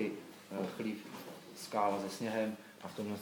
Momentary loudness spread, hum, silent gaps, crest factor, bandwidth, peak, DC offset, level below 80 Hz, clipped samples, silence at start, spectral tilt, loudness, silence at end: 14 LU; none; none; 20 dB; 19 kHz; -18 dBFS; under 0.1%; -86 dBFS; under 0.1%; 0 s; -5 dB/octave; -40 LUFS; 0 s